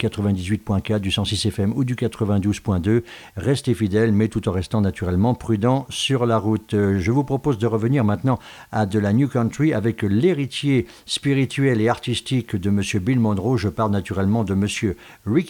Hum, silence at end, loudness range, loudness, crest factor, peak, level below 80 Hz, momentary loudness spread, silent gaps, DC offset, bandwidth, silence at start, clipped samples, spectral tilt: none; 0 s; 1 LU; -21 LUFS; 14 dB; -6 dBFS; -46 dBFS; 4 LU; none; under 0.1%; 18 kHz; 0 s; under 0.1%; -6.5 dB/octave